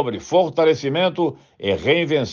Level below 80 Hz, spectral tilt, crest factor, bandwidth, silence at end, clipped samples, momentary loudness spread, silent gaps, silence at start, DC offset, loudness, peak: -56 dBFS; -5.5 dB/octave; 16 dB; 7.2 kHz; 0 s; under 0.1%; 7 LU; none; 0 s; under 0.1%; -19 LUFS; -4 dBFS